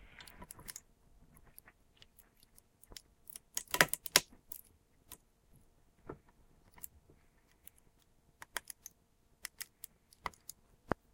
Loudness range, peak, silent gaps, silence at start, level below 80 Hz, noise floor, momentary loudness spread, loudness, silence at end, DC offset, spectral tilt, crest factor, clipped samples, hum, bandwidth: 21 LU; -4 dBFS; none; 0.2 s; -66 dBFS; -71 dBFS; 28 LU; -37 LUFS; 0.2 s; under 0.1%; -1 dB/octave; 40 dB; under 0.1%; none; 17 kHz